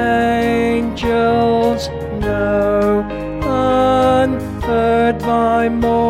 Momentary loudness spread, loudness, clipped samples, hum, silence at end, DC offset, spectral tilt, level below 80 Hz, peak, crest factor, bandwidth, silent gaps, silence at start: 7 LU; -16 LUFS; under 0.1%; none; 0 s; under 0.1%; -6.5 dB/octave; -32 dBFS; -4 dBFS; 12 dB; 15.5 kHz; none; 0 s